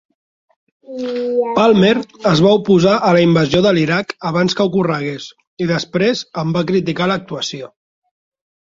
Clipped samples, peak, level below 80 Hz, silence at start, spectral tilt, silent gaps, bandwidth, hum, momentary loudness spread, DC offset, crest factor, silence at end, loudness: under 0.1%; -2 dBFS; -50 dBFS; 0.9 s; -6 dB/octave; 5.47-5.57 s; 7.6 kHz; none; 12 LU; under 0.1%; 14 dB; 1 s; -15 LUFS